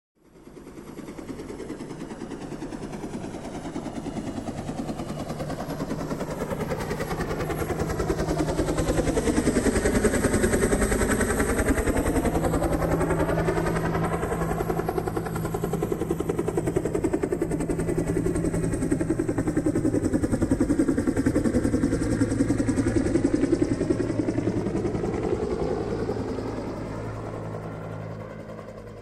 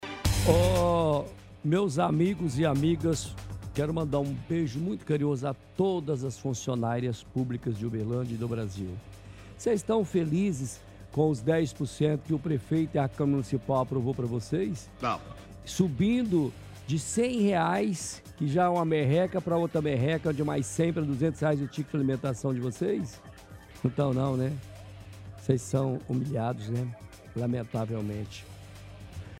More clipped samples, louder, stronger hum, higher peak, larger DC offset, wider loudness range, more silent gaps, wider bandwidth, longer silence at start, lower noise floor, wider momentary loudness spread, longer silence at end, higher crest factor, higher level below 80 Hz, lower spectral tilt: neither; first, -26 LUFS vs -29 LUFS; neither; about the same, -8 dBFS vs -6 dBFS; neither; first, 10 LU vs 5 LU; neither; about the same, 15.5 kHz vs 16 kHz; first, 0.35 s vs 0 s; about the same, -47 dBFS vs -49 dBFS; second, 12 LU vs 15 LU; about the same, 0 s vs 0 s; about the same, 18 dB vs 22 dB; first, -36 dBFS vs -48 dBFS; about the same, -6 dB/octave vs -6.5 dB/octave